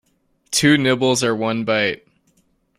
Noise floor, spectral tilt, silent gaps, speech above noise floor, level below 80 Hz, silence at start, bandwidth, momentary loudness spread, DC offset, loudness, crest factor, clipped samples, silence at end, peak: -64 dBFS; -4 dB/octave; none; 46 dB; -56 dBFS; 0.5 s; 16 kHz; 7 LU; under 0.1%; -18 LUFS; 18 dB; under 0.1%; 0.8 s; -2 dBFS